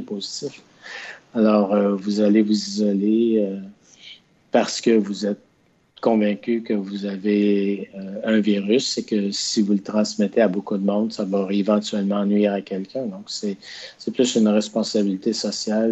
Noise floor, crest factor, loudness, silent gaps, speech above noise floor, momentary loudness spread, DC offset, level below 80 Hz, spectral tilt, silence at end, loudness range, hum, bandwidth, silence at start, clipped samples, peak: -61 dBFS; 18 dB; -21 LUFS; none; 40 dB; 11 LU; under 0.1%; -70 dBFS; -5.5 dB/octave; 0 s; 3 LU; none; 8.2 kHz; 0 s; under 0.1%; -4 dBFS